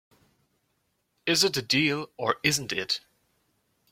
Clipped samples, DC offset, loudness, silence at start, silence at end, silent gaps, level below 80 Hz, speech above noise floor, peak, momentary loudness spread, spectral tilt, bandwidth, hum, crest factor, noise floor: under 0.1%; under 0.1%; -26 LUFS; 1.25 s; 0.95 s; none; -66 dBFS; 48 dB; -6 dBFS; 8 LU; -2.5 dB/octave; 16.5 kHz; none; 24 dB; -75 dBFS